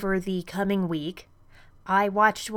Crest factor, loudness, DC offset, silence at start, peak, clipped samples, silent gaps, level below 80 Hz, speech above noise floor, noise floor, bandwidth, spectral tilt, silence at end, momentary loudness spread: 18 dB; -25 LUFS; under 0.1%; 0 s; -8 dBFS; under 0.1%; none; -52 dBFS; 27 dB; -52 dBFS; 17.5 kHz; -5.5 dB/octave; 0 s; 17 LU